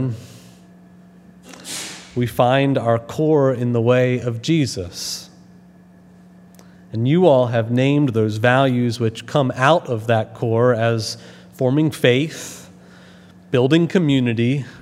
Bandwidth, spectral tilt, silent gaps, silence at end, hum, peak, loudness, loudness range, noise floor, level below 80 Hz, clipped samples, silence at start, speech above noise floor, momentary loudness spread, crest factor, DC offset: 15.5 kHz; -6 dB/octave; none; 0 s; none; 0 dBFS; -18 LUFS; 4 LU; -46 dBFS; -60 dBFS; under 0.1%; 0 s; 29 dB; 12 LU; 20 dB; under 0.1%